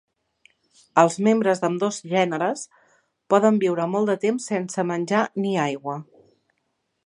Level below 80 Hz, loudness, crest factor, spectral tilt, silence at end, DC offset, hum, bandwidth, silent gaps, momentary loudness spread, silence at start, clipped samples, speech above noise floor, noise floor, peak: -76 dBFS; -22 LUFS; 22 dB; -5.5 dB/octave; 1 s; under 0.1%; none; 11 kHz; none; 8 LU; 0.95 s; under 0.1%; 53 dB; -74 dBFS; -2 dBFS